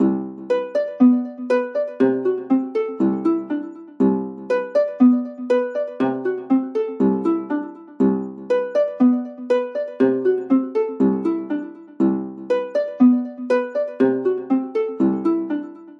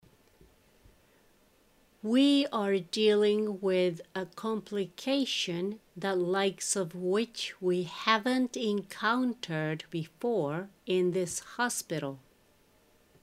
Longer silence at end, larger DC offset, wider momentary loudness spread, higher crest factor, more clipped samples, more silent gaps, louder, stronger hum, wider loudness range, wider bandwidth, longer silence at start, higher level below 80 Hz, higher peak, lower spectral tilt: second, 0.05 s vs 1.05 s; neither; about the same, 9 LU vs 10 LU; second, 16 dB vs 24 dB; neither; neither; first, -21 LUFS vs -30 LUFS; neither; second, 1 LU vs 4 LU; second, 6.4 kHz vs 15.5 kHz; second, 0 s vs 2.05 s; about the same, -76 dBFS vs -72 dBFS; first, -4 dBFS vs -8 dBFS; first, -9 dB/octave vs -4 dB/octave